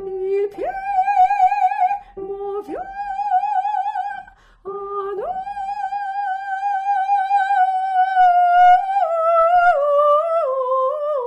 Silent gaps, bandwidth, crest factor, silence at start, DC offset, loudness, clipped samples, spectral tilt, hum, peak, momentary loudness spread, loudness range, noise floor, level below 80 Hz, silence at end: none; 8.4 kHz; 12 dB; 0 s; under 0.1%; -18 LUFS; under 0.1%; -4 dB/octave; none; -6 dBFS; 14 LU; 9 LU; -40 dBFS; -56 dBFS; 0 s